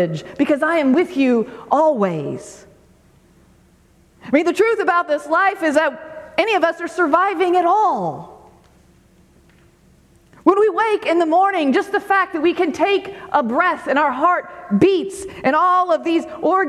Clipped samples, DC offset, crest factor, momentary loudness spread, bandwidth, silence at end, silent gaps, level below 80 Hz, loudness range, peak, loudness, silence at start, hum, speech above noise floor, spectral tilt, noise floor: under 0.1%; under 0.1%; 18 dB; 7 LU; 13 kHz; 0 s; none; -58 dBFS; 4 LU; 0 dBFS; -17 LUFS; 0 s; none; 36 dB; -5.5 dB/octave; -53 dBFS